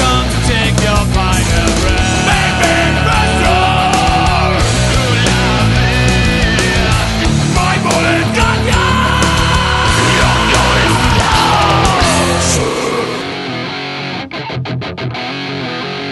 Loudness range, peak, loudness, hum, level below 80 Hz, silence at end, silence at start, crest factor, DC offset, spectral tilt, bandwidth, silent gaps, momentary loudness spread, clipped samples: 4 LU; 0 dBFS; -12 LUFS; none; -20 dBFS; 0 s; 0 s; 12 dB; under 0.1%; -4 dB/octave; 12 kHz; none; 9 LU; under 0.1%